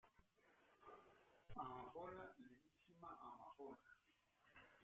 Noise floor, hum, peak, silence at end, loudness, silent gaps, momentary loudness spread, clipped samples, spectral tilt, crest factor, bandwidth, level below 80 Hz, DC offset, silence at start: -82 dBFS; none; -38 dBFS; 0 s; -60 LUFS; none; 14 LU; under 0.1%; -4.5 dB/octave; 22 dB; 7.2 kHz; -78 dBFS; under 0.1%; 0.05 s